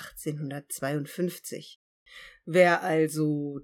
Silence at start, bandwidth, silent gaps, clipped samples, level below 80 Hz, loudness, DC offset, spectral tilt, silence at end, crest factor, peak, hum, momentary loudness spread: 0 s; 19 kHz; 1.76-2.06 s; under 0.1%; -68 dBFS; -27 LUFS; under 0.1%; -5.5 dB/octave; 0 s; 20 dB; -8 dBFS; none; 21 LU